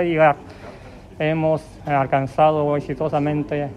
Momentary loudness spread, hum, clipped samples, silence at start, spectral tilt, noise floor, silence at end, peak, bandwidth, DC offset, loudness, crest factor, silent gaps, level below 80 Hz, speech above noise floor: 11 LU; none; under 0.1%; 0 s; -8 dB/octave; -40 dBFS; 0 s; -4 dBFS; 10.5 kHz; under 0.1%; -20 LUFS; 16 dB; none; -48 dBFS; 20 dB